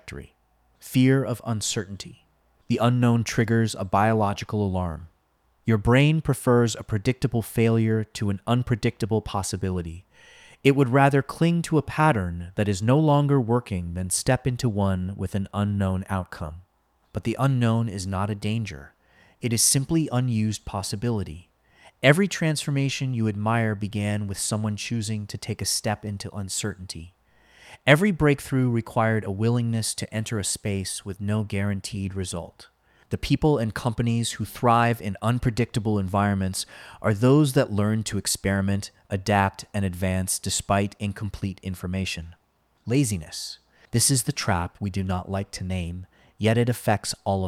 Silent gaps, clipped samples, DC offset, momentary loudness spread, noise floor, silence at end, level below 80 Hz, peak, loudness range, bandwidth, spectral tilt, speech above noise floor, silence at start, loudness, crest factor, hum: none; under 0.1%; under 0.1%; 12 LU; -67 dBFS; 0 s; -48 dBFS; -4 dBFS; 5 LU; 15.5 kHz; -5 dB/octave; 43 dB; 0.05 s; -24 LUFS; 20 dB; none